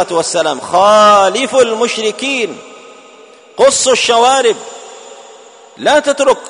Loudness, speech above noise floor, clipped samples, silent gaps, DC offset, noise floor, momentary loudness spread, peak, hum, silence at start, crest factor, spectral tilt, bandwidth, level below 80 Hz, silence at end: -11 LUFS; 29 dB; under 0.1%; none; under 0.1%; -39 dBFS; 17 LU; 0 dBFS; none; 0 s; 12 dB; -1.5 dB/octave; 11 kHz; -56 dBFS; 0 s